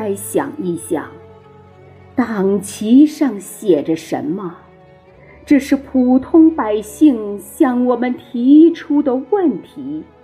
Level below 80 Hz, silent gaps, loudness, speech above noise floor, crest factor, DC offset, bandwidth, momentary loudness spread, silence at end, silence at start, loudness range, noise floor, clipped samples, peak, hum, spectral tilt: -52 dBFS; none; -15 LUFS; 30 dB; 14 dB; under 0.1%; 15.5 kHz; 13 LU; 0.2 s; 0 s; 4 LU; -44 dBFS; under 0.1%; 0 dBFS; none; -6 dB/octave